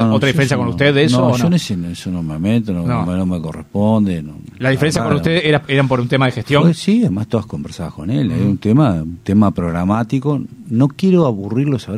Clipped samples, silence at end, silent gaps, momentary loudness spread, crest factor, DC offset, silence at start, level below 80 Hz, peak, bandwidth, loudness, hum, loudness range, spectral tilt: under 0.1%; 0 s; none; 9 LU; 14 dB; under 0.1%; 0 s; -42 dBFS; 0 dBFS; 14 kHz; -16 LUFS; none; 2 LU; -6.5 dB/octave